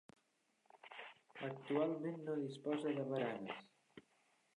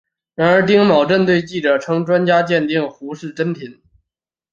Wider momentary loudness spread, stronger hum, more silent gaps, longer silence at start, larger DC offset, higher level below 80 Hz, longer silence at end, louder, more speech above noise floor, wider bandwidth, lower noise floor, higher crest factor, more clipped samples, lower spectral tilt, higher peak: about the same, 17 LU vs 17 LU; neither; neither; first, 0.75 s vs 0.4 s; neither; second, under -90 dBFS vs -58 dBFS; second, 0.55 s vs 0.8 s; second, -43 LUFS vs -15 LUFS; second, 39 dB vs 68 dB; first, 10.5 kHz vs 7.6 kHz; second, -80 dBFS vs -84 dBFS; about the same, 18 dB vs 16 dB; neither; about the same, -7 dB/octave vs -6.5 dB/octave; second, -26 dBFS vs -2 dBFS